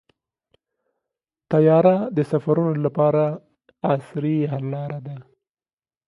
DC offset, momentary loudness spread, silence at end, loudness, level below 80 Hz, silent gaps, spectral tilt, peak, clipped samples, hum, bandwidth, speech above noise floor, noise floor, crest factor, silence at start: under 0.1%; 15 LU; 0.85 s; -21 LUFS; -66 dBFS; none; -10.5 dB/octave; -4 dBFS; under 0.1%; none; 10.5 kHz; over 70 dB; under -90 dBFS; 20 dB; 1.5 s